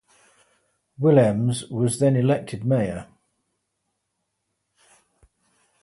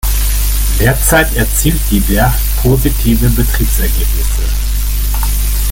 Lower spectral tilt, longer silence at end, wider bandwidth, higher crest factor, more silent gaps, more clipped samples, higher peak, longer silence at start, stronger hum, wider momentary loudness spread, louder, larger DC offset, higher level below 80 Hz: first, -7 dB/octave vs -4.5 dB/octave; first, 2.8 s vs 0 s; second, 11.5 kHz vs 17 kHz; first, 20 dB vs 10 dB; neither; neither; second, -4 dBFS vs 0 dBFS; first, 1 s vs 0.05 s; second, none vs 50 Hz at -15 dBFS; about the same, 8 LU vs 6 LU; second, -21 LUFS vs -13 LUFS; neither; second, -58 dBFS vs -12 dBFS